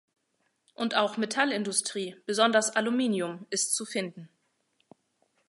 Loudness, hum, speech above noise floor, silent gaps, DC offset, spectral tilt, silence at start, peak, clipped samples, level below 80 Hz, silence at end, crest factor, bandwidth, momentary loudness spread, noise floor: -28 LUFS; none; 47 dB; none; under 0.1%; -2.5 dB/octave; 0.8 s; -8 dBFS; under 0.1%; -82 dBFS; 1.25 s; 22 dB; 12 kHz; 10 LU; -76 dBFS